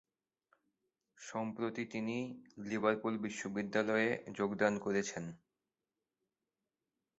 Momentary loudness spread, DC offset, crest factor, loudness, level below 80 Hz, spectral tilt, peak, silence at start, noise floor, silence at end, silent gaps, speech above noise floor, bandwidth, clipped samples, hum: 12 LU; under 0.1%; 24 dB; -37 LUFS; -78 dBFS; -4.5 dB/octave; -16 dBFS; 1.2 s; under -90 dBFS; 1.85 s; none; over 53 dB; 8 kHz; under 0.1%; none